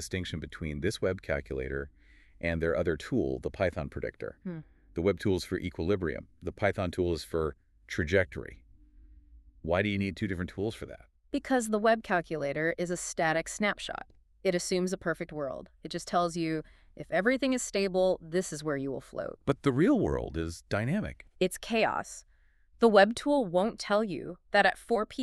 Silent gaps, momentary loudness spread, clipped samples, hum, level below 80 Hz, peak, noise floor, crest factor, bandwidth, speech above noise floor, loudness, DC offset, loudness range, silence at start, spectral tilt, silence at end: none; 13 LU; under 0.1%; none; -50 dBFS; -8 dBFS; -62 dBFS; 22 dB; 13.5 kHz; 32 dB; -31 LUFS; under 0.1%; 5 LU; 0 s; -5 dB/octave; 0 s